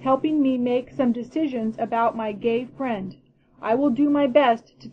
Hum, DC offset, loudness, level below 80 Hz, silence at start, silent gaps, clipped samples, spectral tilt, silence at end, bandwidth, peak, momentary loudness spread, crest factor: none; under 0.1%; -23 LUFS; -60 dBFS; 0 s; none; under 0.1%; -7.5 dB/octave; 0 s; 6.2 kHz; -4 dBFS; 10 LU; 18 dB